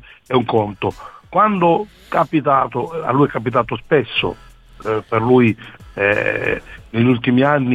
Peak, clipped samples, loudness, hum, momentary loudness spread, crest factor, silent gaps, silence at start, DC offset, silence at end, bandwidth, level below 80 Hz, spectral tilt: -2 dBFS; under 0.1%; -17 LUFS; none; 11 LU; 16 dB; none; 0.3 s; under 0.1%; 0 s; 8.8 kHz; -46 dBFS; -8 dB/octave